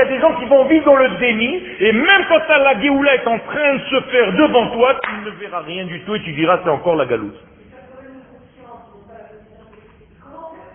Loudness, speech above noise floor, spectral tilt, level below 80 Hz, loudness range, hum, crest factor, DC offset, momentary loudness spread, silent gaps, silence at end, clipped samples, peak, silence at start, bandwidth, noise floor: -15 LUFS; 31 dB; -9 dB/octave; -50 dBFS; 9 LU; none; 16 dB; under 0.1%; 14 LU; none; 0.15 s; under 0.1%; 0 dBFS; 0 s; 3.8 kHz; -46 dBFS